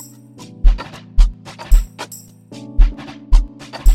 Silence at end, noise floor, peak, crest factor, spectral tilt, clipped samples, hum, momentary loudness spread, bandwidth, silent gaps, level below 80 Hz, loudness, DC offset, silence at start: 0 s; -39 dBFS; 0 dBFS; 14 dB; -5.5 dB/octave; under 0.1%; none; 18 LU; 13 kHz; none; -16 dBFS; -21 LUFS; under 0.1%; 0.65 s